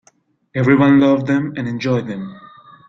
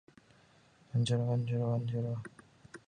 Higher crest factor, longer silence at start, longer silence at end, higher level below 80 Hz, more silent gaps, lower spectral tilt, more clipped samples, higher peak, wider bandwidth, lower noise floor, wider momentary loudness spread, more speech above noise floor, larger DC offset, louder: about the same, 16 dB vs 16 dB; second, 0.55 s vs 0.95 s; first, 0.45 s vs 0.1 s; first, -54 dBFS vs -70 dBFS; neither; about the same, -8 dB/octave vs -7 dB/octave; neither; first, -2 dBFS vs -20 dBFS; second, 7 kHz vs 9.8 kHz; second, -57 dBFS vs -64 dBFS; about the same, 16 LU vs 14 LU; first, 42 dB vs 32 dB; neither; first, -15 LUFS vs -34 LUFS